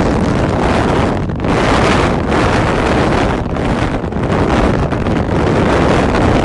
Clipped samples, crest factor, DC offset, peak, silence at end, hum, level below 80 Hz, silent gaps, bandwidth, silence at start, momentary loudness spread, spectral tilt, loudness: under 0.1%; 12 dB; under 0.1%; 0 dBFS; 0 s; none; -22 dBFS; none; 11.5 kHz; 0 s; 5 LU; -6.5 dB/octave; -14 LUFS